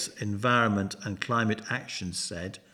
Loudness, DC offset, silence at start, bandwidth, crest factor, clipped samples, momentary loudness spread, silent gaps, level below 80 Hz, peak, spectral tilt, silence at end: -29 LUFS; under 0.1%; 0 s; 14 kHz; 20 dB; under 0.1%; 10 LU; none; -62 dBFS; -10 dBFS; -4.5 dB/octave; 0.15 s